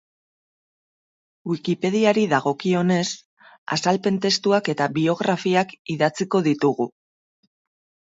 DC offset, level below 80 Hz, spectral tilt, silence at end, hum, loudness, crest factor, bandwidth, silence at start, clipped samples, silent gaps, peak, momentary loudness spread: under 0.1%; -68 dBFS; -5 dB/octave; 1.3 s; none; -21 LUFS; 20 dB; 8 kHz; 1.45 s; under 0.1%; 3.25-3.37 s, 3.58-3.66 s, 5.79-5.85 s; -4 dBFS; 9 LU